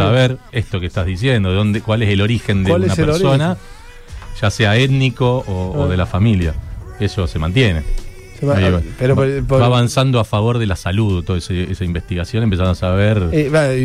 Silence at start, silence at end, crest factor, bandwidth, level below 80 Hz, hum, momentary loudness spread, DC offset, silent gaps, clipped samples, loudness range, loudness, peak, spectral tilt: 0 s; 0 s; 12 dB; 13 kHz; -30 dBFS; none; 8 LU; under 0.1%; none; under 0.1%; 2 LU; -16 LUFS; -2 dBFS; -6.5 dB/octave